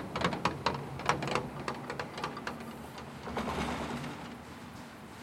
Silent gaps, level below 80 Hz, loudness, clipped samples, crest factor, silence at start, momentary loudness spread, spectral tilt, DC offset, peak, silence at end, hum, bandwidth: none; -56 dBFS; -37 LUFS; under 0.1%; 28 dB; 0 s; 14 LU; -5 dB/octave; under 0.1%; -10 dBFS; 0 s; none; 16.5 kHz